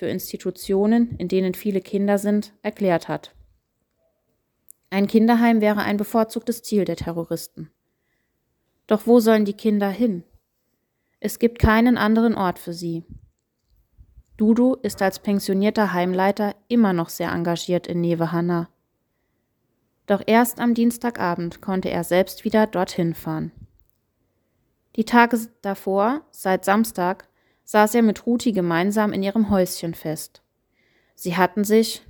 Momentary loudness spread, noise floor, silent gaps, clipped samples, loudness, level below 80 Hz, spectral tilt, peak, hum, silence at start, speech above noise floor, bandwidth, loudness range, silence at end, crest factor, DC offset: 12 LU; -73 dBFS; none; under 0.1%; -21 LUFS; -46 dBFS; -6 dB/octave; 0 dBFS; none; 0 s; 52 dB; over 20 kHz; 4 LU; 0.1 s; 20 dB; under 0.1%